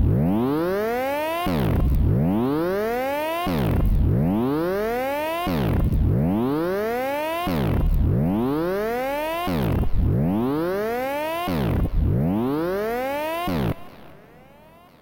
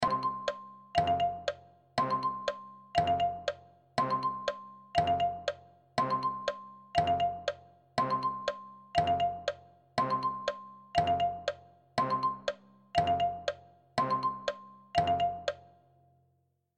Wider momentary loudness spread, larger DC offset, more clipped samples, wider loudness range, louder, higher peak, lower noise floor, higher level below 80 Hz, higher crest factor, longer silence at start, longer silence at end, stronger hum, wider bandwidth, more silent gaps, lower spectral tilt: second, 4 LU vs 13 LU; neither; neither; about the same, 2 LU vs 1 LU; first, -23 LUFS vs -33 LUFS; about the same, -10 dBFS vs -12 dBFS; second, -49 dBFS vs -75 dBFS; first, -30 dBFS vs -60 dBFS; second, 12 dB vs 20 dB; about the same, 0 s vs 0 s; second, 0.8 s vs 1.15 s; neither; first, 17 kHz vs 9.8 kHz; neither; first, -7.5 dB/octave vs -5 dB/octave